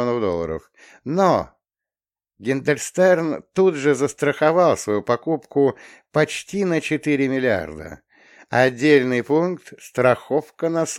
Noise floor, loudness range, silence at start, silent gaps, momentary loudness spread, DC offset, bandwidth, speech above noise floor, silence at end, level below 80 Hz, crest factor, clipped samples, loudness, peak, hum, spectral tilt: under -90 dBFS; 3 LU; 0 s; none; 11 LU; under 0.1%; 15.5 kHz; over 70 dB; 0 s; -56 dBFS; 18 dB; under 0.1%; -20 LUFS; -2 dBFS; none; -5.5 dB/octave